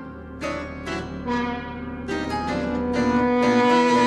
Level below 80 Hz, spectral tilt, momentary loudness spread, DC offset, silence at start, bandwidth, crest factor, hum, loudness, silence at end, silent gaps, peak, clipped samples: -42 dBFS; -5.5 dB/octave; 14 LU; under 0.1%; 0 s; 10.5 kHz; 14 dB; none; -23 LUFS; 0 s; none; -8 dBFS; under 0.1%